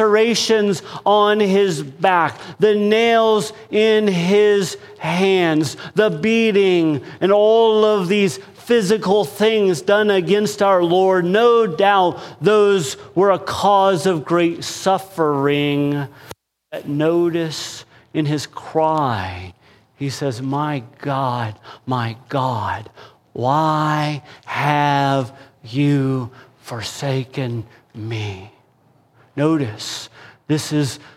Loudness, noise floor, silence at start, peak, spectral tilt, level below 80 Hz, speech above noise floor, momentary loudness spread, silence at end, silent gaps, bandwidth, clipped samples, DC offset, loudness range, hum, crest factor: -18 LUFS; -56 dBFS; 0 s; -2 dBFS; -5.5 dB/octave; -60 dBFS; 39 dB; 13 LU; 0.2 s; none; 15 kHz; under 0.1%; under 0.1%; 8 LU; none; 16 dB